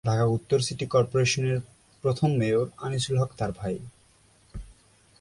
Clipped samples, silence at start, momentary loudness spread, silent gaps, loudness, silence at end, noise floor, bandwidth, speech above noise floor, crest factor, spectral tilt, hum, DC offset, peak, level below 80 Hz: under 0.1%; 0.05 s; 13 LU; none; -26 LUFS; 0.5 s; -60 dBFS; 11.5 kHz; 35 dB; 16 dB; -5.5 dB/octave; none; under 0.1%; -10 dBFS; -52 dBFS